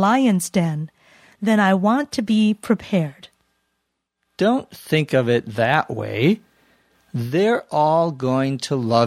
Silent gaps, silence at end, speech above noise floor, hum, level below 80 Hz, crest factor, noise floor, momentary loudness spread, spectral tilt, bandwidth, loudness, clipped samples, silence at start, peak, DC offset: none; 0 s; 57 dB; none; -60 dBFS; 18 dB; -76 dBFS; 9 LU; -6 dB/octave; 15.5 kHz; -20 LUFS; under 0.1%; 0 s; -2 dBFS; under 0.1%